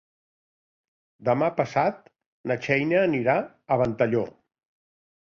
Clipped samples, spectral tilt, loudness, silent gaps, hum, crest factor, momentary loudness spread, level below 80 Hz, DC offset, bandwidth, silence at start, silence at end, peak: under 0.1%; -7.5 dB/octave; -25 LUFS; 2.26-2.44 s; none; 20 dB; 8 LU; -62 dBFS; under 0.1%; 7.2 kHz; 1.2 s; 0.95 s; -8 dBFS